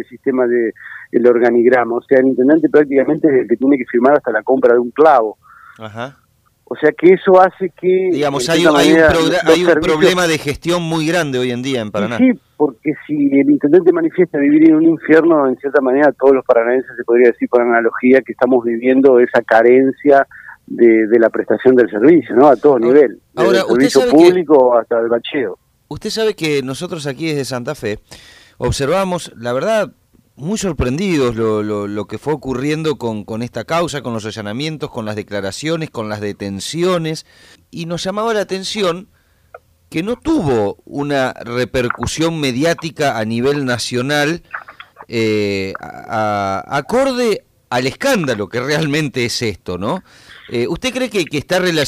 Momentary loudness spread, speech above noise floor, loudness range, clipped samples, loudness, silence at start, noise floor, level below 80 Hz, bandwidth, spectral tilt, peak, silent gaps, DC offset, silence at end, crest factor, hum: 13 LU; 37 dB; 9 LU; under 0.1%; -14 LUFS; 0 s; -51 dBFS; -44 dBFS; 15.5 kHz; -5.5 dB/octave; 0 dBFS; none; under 0.1%; 0 s; 14 dB; none